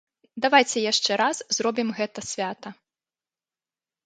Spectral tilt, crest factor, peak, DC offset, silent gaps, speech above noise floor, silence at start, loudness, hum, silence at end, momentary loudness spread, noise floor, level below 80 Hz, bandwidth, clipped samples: -2 dB/octave; 22 dB; -4 dBFS; under 0.1%; none; over 66 dB; 0.35 s; -23 LUFS; none; 1.3 s; 15 LU; under -90 dBFS; -72 dBFS; 9.6 kHz; under 0.1%